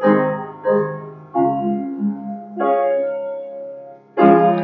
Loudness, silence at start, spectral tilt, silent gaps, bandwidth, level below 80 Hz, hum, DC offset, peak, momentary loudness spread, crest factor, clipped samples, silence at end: -19 LUFS; 0 s; -11 dB/octave; none; 4.6 kHz; -70 dBFS; none; under 0.1%; 0 dBFS; 17 LU; 18 dB; under 0.1%; 0 s